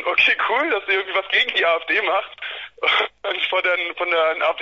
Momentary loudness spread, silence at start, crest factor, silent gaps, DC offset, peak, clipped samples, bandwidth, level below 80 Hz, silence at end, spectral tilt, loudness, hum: 8 LU; 0 s; 16 dB; none; under 0.1%; -4 dBFS; under 0.1%; 7.4 kHz; -62 dBFS; 0 s; -2 dB/octave; -19 LUFS; none